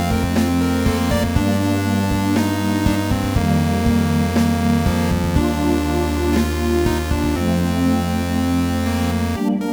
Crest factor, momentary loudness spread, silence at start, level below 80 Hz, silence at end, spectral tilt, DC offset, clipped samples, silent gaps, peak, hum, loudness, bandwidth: 14 dB; 2 LU; 0 s; -28 dBFS; 0 s; -6 dB/octave; under 0.1%; under 0.1%; none; -2 dBFS; none; -18 LUFS; over 20 kHz